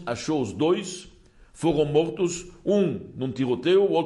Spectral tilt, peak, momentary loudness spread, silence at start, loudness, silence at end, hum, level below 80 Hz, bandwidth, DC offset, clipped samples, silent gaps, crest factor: -5.5 dB/octave; -10 dBFS; 10 LU; 0 s; -25 LUFS; 0 s; none; -54 dBFS; 11.5 kHz; under 0.1%; under 0.1%; none; 16 dB